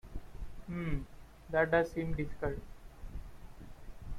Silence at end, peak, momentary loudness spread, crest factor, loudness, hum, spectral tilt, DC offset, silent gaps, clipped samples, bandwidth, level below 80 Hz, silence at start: 0 s; -16 dBFS; 25 LU; 20 dB; -35 LUFS; none; -7.5 dB/octave; under 0.1%; none; under 0.1%; 15 kHz; -46 dBFS; 0.05 s